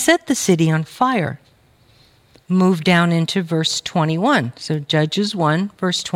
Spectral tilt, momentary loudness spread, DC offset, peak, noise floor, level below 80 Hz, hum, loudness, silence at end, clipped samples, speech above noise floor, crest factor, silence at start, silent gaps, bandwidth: -5 dB/octave; 6 LU; under 0.1%; -2 dBFS; -53 dBFS; -60 dBFS; none; -18 LUFS; 0 s; under 0.1%; 36 dB; 16 dB; 0 s; none; 15.5 kHz